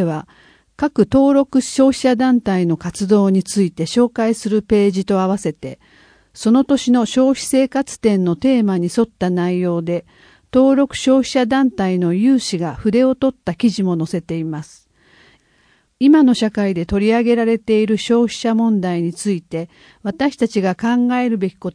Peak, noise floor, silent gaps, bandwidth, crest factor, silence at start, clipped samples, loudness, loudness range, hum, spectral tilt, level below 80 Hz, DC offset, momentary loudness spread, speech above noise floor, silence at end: -2 dBFS; -57 dBFS; none; 10.5 kHz; 16 dB; 0 s; under 0.1%; -16 LUFS; 3 LU; none; -6 dB/octave; -48 dBFS; under 0.1%; 8 LU; 41 dB; 0.05 s